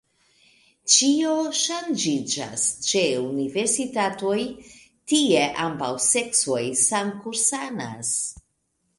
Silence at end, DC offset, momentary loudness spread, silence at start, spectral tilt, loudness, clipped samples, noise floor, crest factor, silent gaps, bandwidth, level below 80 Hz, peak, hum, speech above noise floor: 0.6 s; under 0.1%; 9 LU; 0.85 s; -2 dB/octave; -22 LUFS; under 0.1%; -72 dBFS; 20 dB; none; 11.5 kHz; -62 dBFS; -4 dBFS; none; 49 dB